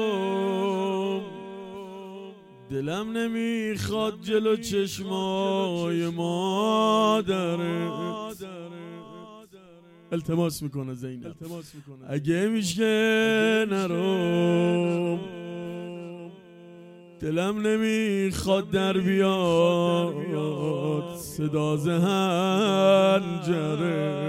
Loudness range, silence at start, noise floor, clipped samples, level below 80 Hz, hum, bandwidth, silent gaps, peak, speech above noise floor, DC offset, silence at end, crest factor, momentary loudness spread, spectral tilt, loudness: 8 LU; 0 s; -51 dBFS; under 0.1%; -58 dBFS; none; 16 kHz; none; -8 dBFS; 27 dB; under 0.1%; 0 s; 18 dB; 18 LU; -6 dB/octave; -25 LUFS